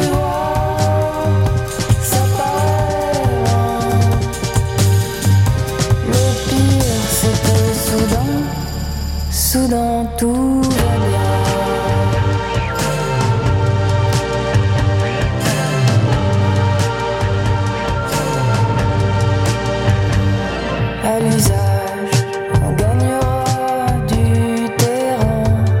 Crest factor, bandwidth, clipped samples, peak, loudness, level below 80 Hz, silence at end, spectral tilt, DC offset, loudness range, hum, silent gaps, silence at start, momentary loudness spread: 14 dB; 17 kHz; under 0.1%; 0 dBFS; -16 LUFS; -28 dBFS; 0 s; -5.5 dB/octave; under 0.1%; 1 LU; none; none; 0 s; 4 LU